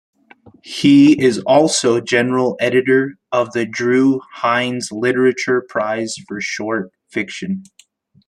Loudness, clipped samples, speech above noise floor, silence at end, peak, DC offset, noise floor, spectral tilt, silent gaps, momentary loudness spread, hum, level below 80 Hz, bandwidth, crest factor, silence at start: -16 LUFS; under 0.1%; 36 dB; 0.65 s; -2 dBFS; under 0.1%; -52 dBFS; -4.5 dB/octave; none; 12 LU; none; -60 dBFS; 11.5 kHz; 16 dB; 0.65 s